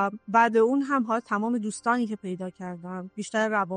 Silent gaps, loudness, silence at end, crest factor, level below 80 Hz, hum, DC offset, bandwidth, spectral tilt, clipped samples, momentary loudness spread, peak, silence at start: none; -26 LUFS; 0 s; 18 dB; -74 dBFS; none; under 0.1%; 10.5 kHz; -5.5 dB/octave; under 0.1%; 15 LU; -8 dBFS; 0 s